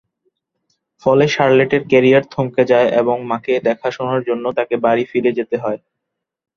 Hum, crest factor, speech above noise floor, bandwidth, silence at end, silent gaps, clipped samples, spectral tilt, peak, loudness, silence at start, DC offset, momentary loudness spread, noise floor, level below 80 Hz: none; 16 dB; 63 dB; 7 kHz; 0.8 s; none; under 0.1%; -6.5 dB/octave; -2 dBFS; -16 LUFS; 1.05 s; under 0.1%; 8 LU; -79 dBFS; -58 dBFS